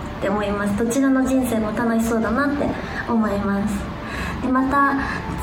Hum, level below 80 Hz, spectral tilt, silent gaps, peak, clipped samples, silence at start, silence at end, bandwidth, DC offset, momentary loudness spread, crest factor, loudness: none; -38 dBFS; -6 dB/octave; none; -6 dBFS; under 0.1%; 0 s; 0 s; 19.5 kHz; under 0.1%; 7 LU; 14 dB; -21 LUFS